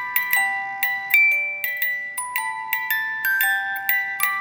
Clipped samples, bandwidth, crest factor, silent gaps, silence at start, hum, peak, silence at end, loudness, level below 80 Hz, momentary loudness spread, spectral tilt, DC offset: under 0.1%; over 20 kHz; 22 dB; none; 0 s; none; 0 dBFS; 0 s; -20 LUFS; -78 dBFS; 9 LU; 1.5 dB/octave; under 0.1%